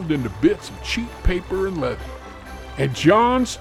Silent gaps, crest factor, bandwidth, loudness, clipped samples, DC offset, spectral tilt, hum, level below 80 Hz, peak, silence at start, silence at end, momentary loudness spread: none; 18 dB; 14 kHz; -21 LUFS; under 0.1%; under 0.1%; -5.5 dB/octave; none; -32 dBFS; -2 dBFS; 0 s; 0 s; 19 LU